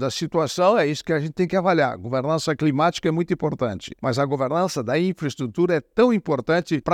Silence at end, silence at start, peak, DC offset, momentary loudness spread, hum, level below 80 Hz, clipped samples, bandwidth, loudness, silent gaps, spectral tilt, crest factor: 0 s; 0 s; -4 dBFS; under 0.1%; 6 LU; none; -56 dBFS; under 0.1%; 16 kHz; -22 LUFS; none; -6 dB/octave; 16 dB